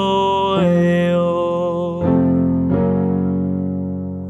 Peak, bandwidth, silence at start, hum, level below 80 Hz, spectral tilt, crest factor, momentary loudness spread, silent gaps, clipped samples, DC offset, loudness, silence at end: -4 dBFS; 8 kHz; 0 s; none; -50 dBFS; -8.5 dB/octave; 12 dB; 6 LU; none; under 0.1%; under 0.1%; -17 LUFS; 0 s